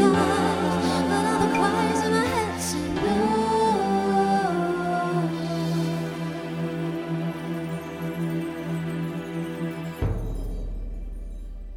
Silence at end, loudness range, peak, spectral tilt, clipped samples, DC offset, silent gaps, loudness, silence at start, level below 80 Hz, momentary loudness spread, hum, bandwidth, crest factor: 0 s; 8 LU; -8 dBFS; -6 dB/octave; under 0.1%; under 0.1%; none; -25 LUFS; 0 s; -40 dBFS; 11 LU; none; 16 kHz; 18 dB